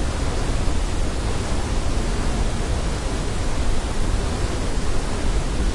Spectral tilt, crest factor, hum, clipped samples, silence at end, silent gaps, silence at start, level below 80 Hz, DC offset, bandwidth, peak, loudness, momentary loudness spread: -5 dB/octave; 14 dB; none; under 0.1%; 0 s; none; 0 s; -22 dBFS; under 0.1%; 11.5 kHz; -6 dBFS; -25 LUFS; 1 LU